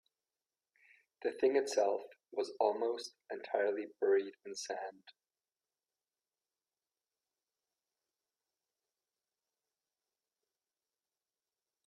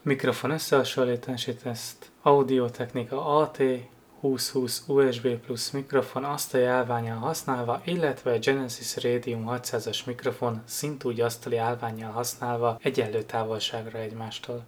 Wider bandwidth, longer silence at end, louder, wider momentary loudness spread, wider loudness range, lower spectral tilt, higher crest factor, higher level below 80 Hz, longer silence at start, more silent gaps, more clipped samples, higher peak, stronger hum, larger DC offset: second, 12 kHz vs over 20 kHz; first, 6.75 s vs 0 s; second, -36 LUFS vs -28 LUFS; first, 13 LU vs 9 LU; first, 15 LU vs 4 LU; second, -2.5 dB/octave vs -4.5 dB/octave; about the same, 24 dB vs 22 dB; second, under -90 dBFS vs -68 dBFS; first, 1.2 s vs 0.05 s; neither; neither; second, -18 dBFS vs -6 dBFS; neither; neither